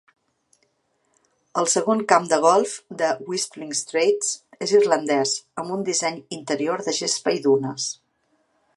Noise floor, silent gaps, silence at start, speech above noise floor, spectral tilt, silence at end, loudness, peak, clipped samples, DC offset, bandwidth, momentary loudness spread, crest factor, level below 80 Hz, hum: -69 dBFS; none; 1.55 s; 48 dB; -3 dB/octave; 0.85 s; -22 LUFS; -2 dBFS; under 0.1%; under 0.1%; 11.5 kHz; 11 LU; 22 dB; -76 dBFS; none